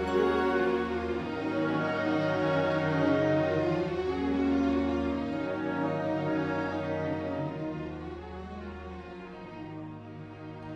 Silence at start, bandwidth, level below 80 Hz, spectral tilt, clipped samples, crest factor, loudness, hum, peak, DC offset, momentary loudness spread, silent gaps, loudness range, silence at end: 0 s; 8.2 kHz; -50 dBFS; -7.5 dB/octave; under 0.1%; 16 dB; -30 LUFS; none; -14 dBFS; under 0.1%; 16 LU; none; 9 LU; 0 s